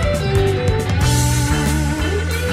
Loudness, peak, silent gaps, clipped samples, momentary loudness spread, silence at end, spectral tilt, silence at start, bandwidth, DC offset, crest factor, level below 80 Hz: -17 LUFS; -4 dBFS; none; under 0.1%; 4 LU; 0 s; -5 dB/octave; 0 s; 16 kHz; under 0.1%; 12 dB; -26 dBFS